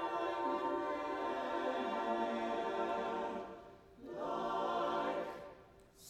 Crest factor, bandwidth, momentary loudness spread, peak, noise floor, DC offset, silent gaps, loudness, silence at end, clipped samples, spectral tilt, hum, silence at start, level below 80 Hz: 14 dB; 14.5 kHz; 14 LU; -26 dBFS; -61 dBFS; under 0.1%; none; -39 LUFS; 0 s; under 0.1%; -5 dB/octave; none; 0 s; -70 dBFS